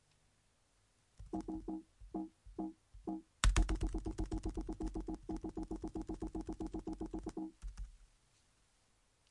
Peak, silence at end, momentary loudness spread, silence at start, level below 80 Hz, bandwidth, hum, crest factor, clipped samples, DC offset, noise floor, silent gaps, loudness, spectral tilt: -14 dBFS; 1.25 s; 12 LU; 1.2 s; -44 dBFS; 11.5 kHz; none; 28 dB; under 0.1%; under 0.1%; -75 dBFS; none; -44 LUFS; -5 dB/octave